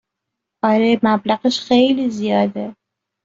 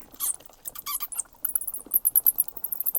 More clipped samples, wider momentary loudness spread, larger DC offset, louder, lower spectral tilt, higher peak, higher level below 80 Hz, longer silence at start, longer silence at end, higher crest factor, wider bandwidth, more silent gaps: neither; second, 7 LU vs 13 LU; neither; first, -17 LUFS vs -25 LUFS; first, -5.5 dB/octave vs 1 dB/octave; first, -2 dBFS vs -6 dBFS; about the same, -60 dBFS vs -62 dBFS; first, 0.65 s vs 0 s; first, 0.55 s vs 0 s; second, 16 dB vs 22 dB; second, 7.6 kHz vs 19 kHz; neither